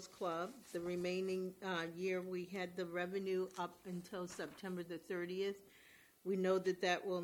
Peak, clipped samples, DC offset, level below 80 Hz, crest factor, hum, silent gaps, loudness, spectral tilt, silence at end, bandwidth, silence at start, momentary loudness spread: -24 dBFS; under 0.1%; under 0.1%; -80 dBFS; 18 dB; none; none; -42 LUFS; -5.5 dB/octave; 0 s; 18.5 kHz; 0 s; 10 LU